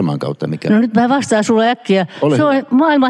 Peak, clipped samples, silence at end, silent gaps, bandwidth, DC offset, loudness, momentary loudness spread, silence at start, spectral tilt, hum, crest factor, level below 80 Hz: -2 dBFS; under 0.1%; 0 s; none; 11 kHz; under 0.1%; -14 LUFS; 7 LU; 0 s; -6 dB/octave; none; 12 dB; -64 dBFS